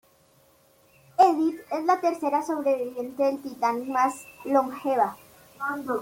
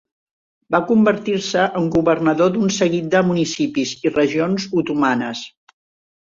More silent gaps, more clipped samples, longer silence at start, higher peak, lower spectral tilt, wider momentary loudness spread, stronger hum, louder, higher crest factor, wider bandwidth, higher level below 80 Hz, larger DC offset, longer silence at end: neither; neither; first, 1.2 s vs 0.7 s; second, -6 dBFS vs -2 dBFS; about the same, -4.5 dB/octave vs -5.5 dB/octave; first, 11 LU vs 5 LU; neither; second, -25 LUFS vs -18 LUFS; about the same, 20 dB vs 16 dB; first, 16.5 kHz vs 7.8 kHz; second, -72 dBFS vs -54 dBFS; neither; second, 0 s vs 0.7 s